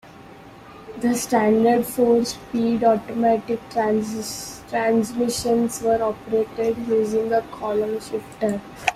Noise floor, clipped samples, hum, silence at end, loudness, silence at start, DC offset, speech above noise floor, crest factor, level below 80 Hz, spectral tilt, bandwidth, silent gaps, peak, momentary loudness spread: -43 dBFS; under 0.1%; none; 0 s; -22 LUFS; 0.05 s; under 0.1%; 22 dB; 20 dB; -54 dBFS; -4.5 dB/octave; 15.5 kHz; none; -2 dBFS; 9 LU